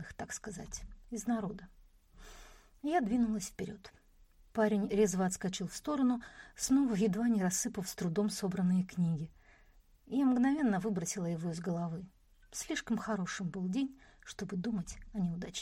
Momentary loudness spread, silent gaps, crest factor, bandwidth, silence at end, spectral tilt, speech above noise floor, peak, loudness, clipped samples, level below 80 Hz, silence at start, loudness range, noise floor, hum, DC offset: 15 LU; none; 18 dB; 16.5 kHz; 0 s; -5.5 dB/octave; 29 dB; -18 dBFS; -35 LUFS; under 0.1%; -58 dBFS; 0 s; 6 LU; -63 dBFS; none; under 0.1%